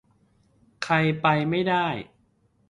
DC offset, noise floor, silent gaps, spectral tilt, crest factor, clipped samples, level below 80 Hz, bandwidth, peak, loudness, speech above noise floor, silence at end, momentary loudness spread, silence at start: under 0.1%; -65 dBFS; none; -6.5 dB/octave; 20 dB; under 0.1%; -60 dBFS; 11 kHz; -6 dBFS; -24 LUFS; 42 dB; 0.65 s; 11 LU; 0.8 s